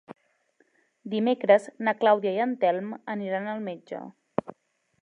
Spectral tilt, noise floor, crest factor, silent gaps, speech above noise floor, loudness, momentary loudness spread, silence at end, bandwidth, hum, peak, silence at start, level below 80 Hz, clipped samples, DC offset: -6.5 dB/octave; -68 dBFS; 22 dB; none; 42 dB; -26 LUFS; 15 LU; 0.55 s; 10 kHz; none; -6 dBFS; 0.1 s; -76 dBFS; under 0.1%; under 0.1%